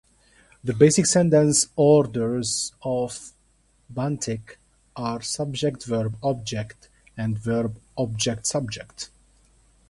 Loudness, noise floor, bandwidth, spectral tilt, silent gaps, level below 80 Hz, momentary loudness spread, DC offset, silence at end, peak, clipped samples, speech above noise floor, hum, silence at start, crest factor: -23 LUFS; -62 dBFS; 11.5 kHz; -4.5 dB/octave; none; -54 dBFS; 17 LU; under 0.1%; 0.85 s; -2 dBFS; under 0.1%; 39 dB; none; 0.65 s; 22 dB